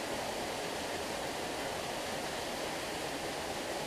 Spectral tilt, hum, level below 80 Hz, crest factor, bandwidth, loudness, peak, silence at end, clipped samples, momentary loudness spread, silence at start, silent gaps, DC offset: -2.5 dB/octave; none; -60 dBFS; 12 dB; 15.5 kHz; -37 LUFS; -26 dBFS; 0 s; under 0.1%; 0 LU; 0 s; none; under 0.1%